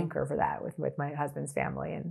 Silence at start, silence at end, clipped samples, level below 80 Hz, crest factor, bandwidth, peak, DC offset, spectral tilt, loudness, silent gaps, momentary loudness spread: 0 s; 0 s; under 0.1%; -60 dBFS; 20 dB; 13 kHz; -14 dBFS; under 0.1%; -7 dB/octave; -33 LUFS; none; 4 LU